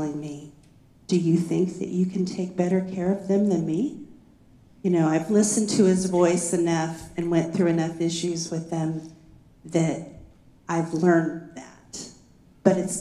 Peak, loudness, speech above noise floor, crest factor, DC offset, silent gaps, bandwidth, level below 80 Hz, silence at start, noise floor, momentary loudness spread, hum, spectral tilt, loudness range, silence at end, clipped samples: -2 dBFS; -24 LUFS; 31 dB; 22 dB; under 0.1%; none; 12.5 kHz; -60 dBFS; 0 s; -54 dBFS; 17 LU; none; -6 dB/octave; 5 LU; 0 s; under 0.1%